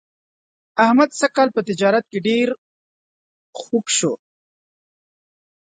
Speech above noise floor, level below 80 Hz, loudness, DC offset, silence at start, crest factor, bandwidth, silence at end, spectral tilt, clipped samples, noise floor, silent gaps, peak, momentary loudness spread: over 73 dB; -70 dBFS; -18 LUFS; under 0.1%; 0.75 s; 20 dB; 9.6 kHz; 1.5 s; -3.5 dB/octave; under 0.1%; under -90 dBFS; 2.58-3.53 s; 0 dBFS; 16 LU